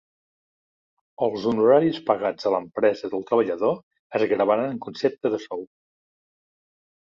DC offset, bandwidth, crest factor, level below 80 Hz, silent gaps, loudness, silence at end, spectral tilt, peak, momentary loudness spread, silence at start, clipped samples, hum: under 0.1%; 7.2 kHz; 20 dB; -68 dBFS; 3.83-3.91 s, 3.99-4.10 s; -23 LUFS; 1.35 s; -7 dB/octave; -6 dBFS; 11 LU; 1.2 s; under 0.1%; none